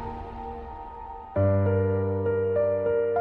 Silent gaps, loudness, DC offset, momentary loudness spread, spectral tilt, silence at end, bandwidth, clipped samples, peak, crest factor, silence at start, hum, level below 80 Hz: none; -25 LUFS; under 0.1%; 16 LU; -11.5 dB/octave; 0 s; 3.3 kHz; under 0.1%; -12 dBFS; 14 dB; 0 s; none; -48 dBFS